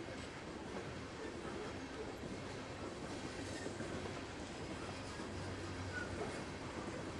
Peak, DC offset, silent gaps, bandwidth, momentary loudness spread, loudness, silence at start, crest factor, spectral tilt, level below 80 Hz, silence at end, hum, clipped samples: -30 dBFS; under 0.1%; none; 12 kHz; 3 LU; -46 LUFS; 0 s; 16 dB; -5 dB/octave; -62 dBFS; 0 s; none; under 0.1%